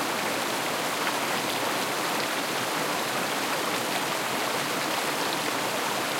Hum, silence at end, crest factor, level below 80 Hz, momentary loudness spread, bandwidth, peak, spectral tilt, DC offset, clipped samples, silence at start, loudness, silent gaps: none; 0 s; 16 dB; -76 dBFS; 1 LU; 16.5 kHz; -12 dBFS; -2 dB/octave; under 0.1%; under 0.1%; 0 s; -27 LUFS; none